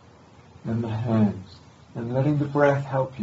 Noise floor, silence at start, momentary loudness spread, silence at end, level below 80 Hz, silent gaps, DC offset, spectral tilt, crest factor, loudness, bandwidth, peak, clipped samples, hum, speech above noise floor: -51 dBFS; 0.65 s; 16 LU; 0 s; -58 dBFS; none; under 0.1%; -9 dB/octave; 20 dB; -24 LUFS; 7.8 kHz; -4 dBFS; under 0.1%; none; 28 dB